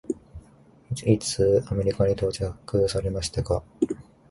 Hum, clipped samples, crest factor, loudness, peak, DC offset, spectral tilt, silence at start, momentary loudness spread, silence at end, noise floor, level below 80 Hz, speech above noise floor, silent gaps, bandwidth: none; under 0.1%; 20 dB; -26 LUFS; -6 dBFS; under 0.1%; -6 dB/octave; 0.1 s; 11 LU; 0.3 s; -54 dBFS; -42 dBFS; 30 dB; none; 11.5 kHz